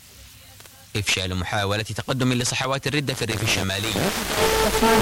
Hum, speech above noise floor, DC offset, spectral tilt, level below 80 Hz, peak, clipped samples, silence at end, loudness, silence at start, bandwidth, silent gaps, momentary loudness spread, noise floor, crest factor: none; 24 dB; under 0.1%; -3.5 dB/octave; -40 dBFS; -6 dBFS; under 0.1%; 0 s; -22 LUFS; 0.05 s; 17 kHz; none; 6 LU; -46 dBFS; 16 dB